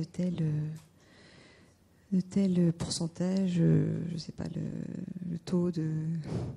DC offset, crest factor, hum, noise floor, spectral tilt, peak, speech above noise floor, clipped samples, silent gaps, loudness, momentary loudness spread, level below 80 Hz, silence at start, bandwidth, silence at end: under 0.1%; 16 dB; none; -62 dBFS; -7 dB/octave; -16 dBFS; 31 dB; under 0.1%; none; -32 LUFS; 12 LU; -60 dBFS; 0 s; 11 kHz; 0 s